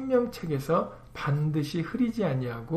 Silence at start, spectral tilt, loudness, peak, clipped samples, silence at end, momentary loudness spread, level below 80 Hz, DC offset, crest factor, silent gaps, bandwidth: 0 s; -7.5 dB/octave; -29 LUFS; -14 dBFS; under 0.1%; 0 s; 5 LU; -54 dBFS; under 0.1%; 16 dB; none; 14.5 kHz